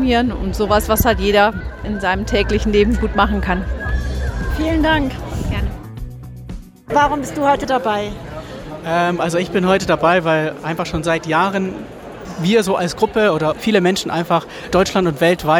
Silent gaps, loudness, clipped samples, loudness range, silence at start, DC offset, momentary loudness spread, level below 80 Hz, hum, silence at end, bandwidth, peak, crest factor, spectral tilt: none; -17 LUFS; under 0.1%; 4 LU; 0 s; under 0.1%; 16 LU; -28 dBFS; none; 0 s; 19.5 kHz; -2 dBFS; 16 dB; -5.5 dB/octave